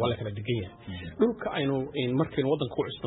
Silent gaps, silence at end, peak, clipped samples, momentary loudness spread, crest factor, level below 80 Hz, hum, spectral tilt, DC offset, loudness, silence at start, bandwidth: none; 0 s; -12 dBFS; under 0.1%; 8 LU; 18 dB; -56 dBFS; none; -11 dB/octave; under 0.1%; -29 LUFS; 0 s; 4.1 kHz